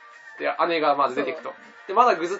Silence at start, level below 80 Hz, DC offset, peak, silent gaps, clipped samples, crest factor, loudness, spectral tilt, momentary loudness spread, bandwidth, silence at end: 0.05 s; -80 dBFS; under 0.1%; -4 dBFS; none; under 0.1%; 20 dB; -23 LUFS; -4 dB/octave; 19 LU; 8 kHz; 0 s